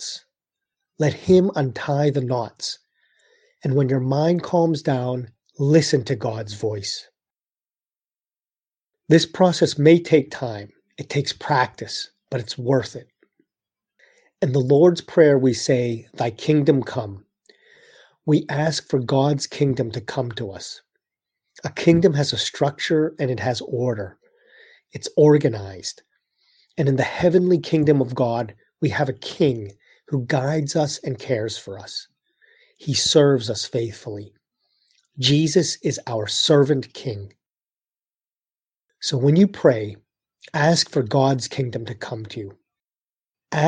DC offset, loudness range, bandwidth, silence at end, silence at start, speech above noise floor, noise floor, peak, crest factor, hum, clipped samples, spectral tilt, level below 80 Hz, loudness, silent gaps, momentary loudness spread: under 0.1%; 5 LU; 9.8 kHz; 0 s; 0 s; over 70 dB; under -90 dBFS; -2 dBFS; 20 dB; none; under 0.1%; -5.5 dB/octave; -58 dBFS; -21 LUFS; none; 16 LU